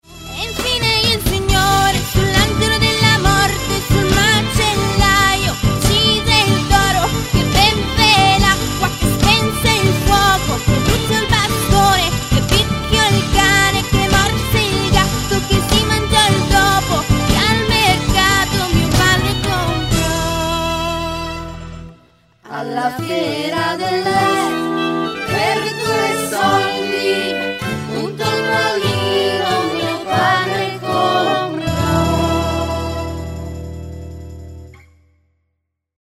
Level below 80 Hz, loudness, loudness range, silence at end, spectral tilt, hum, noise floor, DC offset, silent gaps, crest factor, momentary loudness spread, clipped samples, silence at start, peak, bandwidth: -26 dBFS; -15 LUFS; 7 LU; 1.3 s; -4 dB/octave; none; -72 dBFS; under 0.1%; none; 16 dB; 9 LU; under 0.1%; 0.1 s; 0 dBFS; 16 kHz